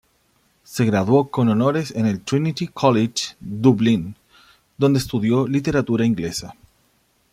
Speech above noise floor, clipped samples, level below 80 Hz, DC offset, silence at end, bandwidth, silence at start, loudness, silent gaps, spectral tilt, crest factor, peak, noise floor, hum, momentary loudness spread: 44 dB; under 0.1%; -52 dBFS; under 0.1%; 0.8 s; 15.5 kHz; 0.7 s; -20 LUFS; none; -6.5 dB/octave; 18 dB; -2 dBFS; -63 dBFS; none; 10 LU